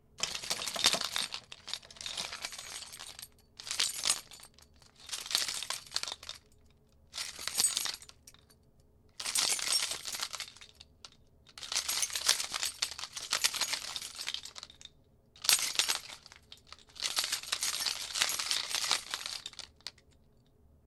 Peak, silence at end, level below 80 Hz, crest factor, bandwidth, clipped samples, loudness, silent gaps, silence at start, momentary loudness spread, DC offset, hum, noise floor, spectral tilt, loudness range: -6 dBFS; 0.95 s; -68 dBFS; 32 dB; 18 kHz; under 0.1%; -32 LUFS; none; 0.2 s; 21 LU; under 0.1%; none; -64 dBFS; 1.5 dB/octave; 4 LU